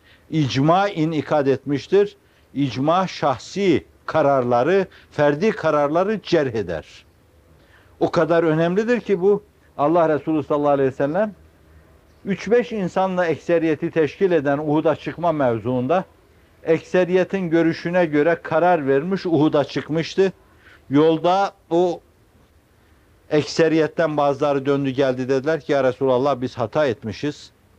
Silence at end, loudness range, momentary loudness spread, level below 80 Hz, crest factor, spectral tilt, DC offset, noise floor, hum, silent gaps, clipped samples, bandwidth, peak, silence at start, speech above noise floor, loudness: 0.3 s; 3 LU; 6 LU; -58 dBFS; 16 dB; -7 dB/octave; under 0.1%; -55 dBFS; none; none; under 0.1%; 9.2 kHz; -4 dBFS; 0.3 s; 36 dB; -20 LUFS